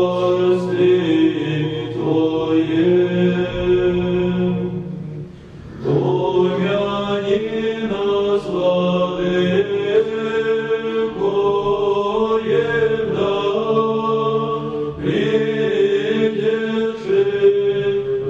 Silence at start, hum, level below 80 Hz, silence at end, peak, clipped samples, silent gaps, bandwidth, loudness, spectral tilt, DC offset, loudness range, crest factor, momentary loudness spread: 0 s; none; -46 dBFS; 0 s; -4 dBFS; under 0.1%; none; 7.8 kHz; -18 LUFS; -7.5 dB/octave; under 0.1%; 3 LU; 14 dB; 6 LU